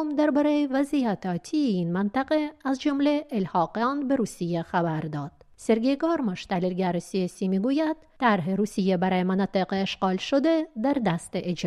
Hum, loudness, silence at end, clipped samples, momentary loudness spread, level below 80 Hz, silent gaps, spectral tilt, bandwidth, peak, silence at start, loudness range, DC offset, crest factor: none; -26 LUFS; 0 s; under 0.1%; 6 LU; -60 dBFS; none; -6.5 dB/octave; 12.5 kHz; -8 dBFS; 0 s; 2 LU; under 0.1%; 16 dB